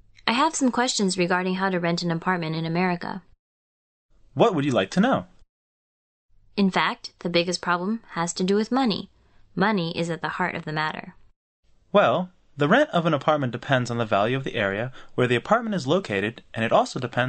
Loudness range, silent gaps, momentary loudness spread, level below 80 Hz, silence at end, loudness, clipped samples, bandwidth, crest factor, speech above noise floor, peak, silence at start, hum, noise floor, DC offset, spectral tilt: 4 LU; 3.39-4.09 s, 5.49-6.29 s, 11.36-11.63 s; 8 LU; -58 dBFS; 0 s; -24 LUFS; under 0.1%; 8.8 kHz; 22 dB; over 67 dB; -2 dBFS; 0.25 s; none; under -90 dBFS; under 0.1%; -5 dB/octave